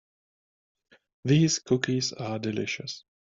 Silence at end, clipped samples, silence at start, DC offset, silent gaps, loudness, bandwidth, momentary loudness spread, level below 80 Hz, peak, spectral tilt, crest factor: 0.25 s; under 0.1%; 1.25 s; under 0.1%; none; -27 LUFS; 7.8 kHz; 12 LU; -64 dBFS; -10 dBFS; -5 dB/octave; 20 dB